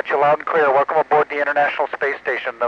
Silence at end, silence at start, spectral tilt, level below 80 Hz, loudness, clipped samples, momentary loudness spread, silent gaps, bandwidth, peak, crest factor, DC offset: 0 s; 0.05 s; -5.5 dB/octave; -66 dBFS; -18 LUFS; under 0.1%; 6 LU; none; 7 kHz; -6 dBFS; 12 dB; under 0.1%